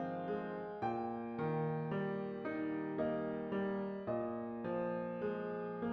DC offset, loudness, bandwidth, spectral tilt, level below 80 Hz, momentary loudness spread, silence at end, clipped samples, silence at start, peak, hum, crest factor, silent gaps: under 0.1%; -40 LUFS; 5.6 kHz; -7 dB/octave; -74 dBFS; 3 LU; 0 s; under 0.1%; 0 s; -26 dBFS; none; 14 dB; none